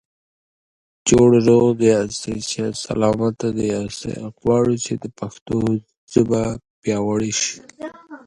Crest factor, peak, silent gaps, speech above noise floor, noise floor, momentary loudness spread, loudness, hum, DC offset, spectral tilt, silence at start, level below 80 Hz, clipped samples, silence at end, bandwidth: 18 dB; 0 dBFS; 5.41-5.46 s, 5.97-6.07 s, 6.70-6.82 s; over 71 dB; under -90 dBFS; 14 LU; -19 LUFS; none; under 0.1%; -5.5 dB/octave; 1.05 s; -48 dBFS; under 0.1%; 0.1 s; 11.5 kHz